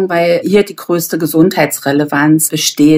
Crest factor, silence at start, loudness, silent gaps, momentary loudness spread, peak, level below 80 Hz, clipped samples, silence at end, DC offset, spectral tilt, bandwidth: 12 dB; 0 s; -12 LUFS; none; 5 LU; 0 dBFS; -52 dBFS; under 0.1%; 0 s; under 0.1%; -4.5 dB/octave; 16.5 kHz